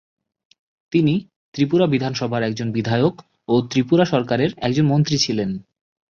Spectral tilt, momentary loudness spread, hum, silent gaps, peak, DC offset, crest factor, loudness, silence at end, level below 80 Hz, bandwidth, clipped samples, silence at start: -6 dB/octave; 7 LU; none; 1.36-1.52 s; -4 dBFS; under 0.1%; 16 dB; -20 LUFS; 0.5 s; -54 dBFS; 7.2 kHz; under 0.1%; 0.9 s